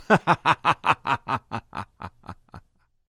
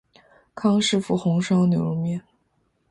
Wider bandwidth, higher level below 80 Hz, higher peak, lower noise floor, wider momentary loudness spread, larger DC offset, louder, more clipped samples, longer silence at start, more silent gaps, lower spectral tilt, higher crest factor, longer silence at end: first, 14.5 kHz vs 11 kHz; about the same, -56 dBFS vs -60 dBFS; first, -2 dBFS vs -10 dBFS; second, -53 dBFS vs -68 dBFS; first, 22 LU vs 8 LU; neither; about the same, -23 LUFS vs -22 LUFS; neither; second, 0 s vs 0.55 s; neither; about the same, -5.5 dB/octave vs -6 dB/octave; first, 24 dB vs 14 dB; second, 0.5 s vs 0.7 s